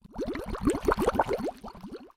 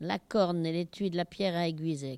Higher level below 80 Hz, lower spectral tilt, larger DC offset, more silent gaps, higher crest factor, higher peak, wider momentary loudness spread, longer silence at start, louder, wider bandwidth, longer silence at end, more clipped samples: first, -42 dBFS vs -66 dBFS; about the same, -6 dB/octave vs -6.5 dB/octave; neither; neither; first, 22 dB vs 16 dB; first, -8 dBFS vs -16 dBFS; first, 17 LU vs 4 LU; about the same, 0.05 s vs 0 s; about the same, -29 LUFS vs -31 LUFS; first, 16.5 kHz vs 12.5 kHz; about the same, 0.1 s vs 0 s; neither